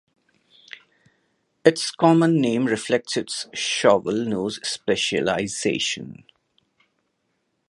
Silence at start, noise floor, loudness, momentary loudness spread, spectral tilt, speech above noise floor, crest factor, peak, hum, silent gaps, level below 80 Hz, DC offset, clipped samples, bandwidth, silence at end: 1.65 s; -73 dBFS; -22 LUFS; 13 LU; -4.5 dB/octave; 51 dB; 22 dB; 0 dBFS; none; none; -62 dBFS; under 0.1%; under 0.1%; 11.5 kHz; 1.55 s